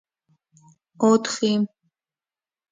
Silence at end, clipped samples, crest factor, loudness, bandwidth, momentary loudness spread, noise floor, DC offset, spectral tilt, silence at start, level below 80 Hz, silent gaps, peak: 1.05 s; under 0.1%; 20 dB; -22 LUFS; 9.4 kHz; 7 LU; under -90 dBFS; under 0.1%; -5 dB/octave; 1 s; -74 dBFS; none; -6 dBFS